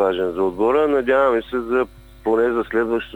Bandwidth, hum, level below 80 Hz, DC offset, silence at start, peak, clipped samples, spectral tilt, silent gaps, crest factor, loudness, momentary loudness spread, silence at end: 19 kHz; none; -46 dBFS; under 0.1%; 0 s; -4 dBFS; under 0.1%; -6.5 dB/octave; none; 14 dB; -20 LUFS; 6 LU; 0 s